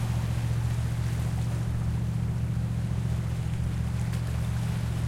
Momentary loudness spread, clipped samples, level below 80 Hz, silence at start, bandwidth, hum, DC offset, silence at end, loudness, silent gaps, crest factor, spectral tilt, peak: 1 LU; under 0.1%; -36 dBFS; 0 s; 14.5 kHz; none; under 0.1%; 0 s; -30 LUFS; none; 10 dB; -7 dB/octave; -18 dBFS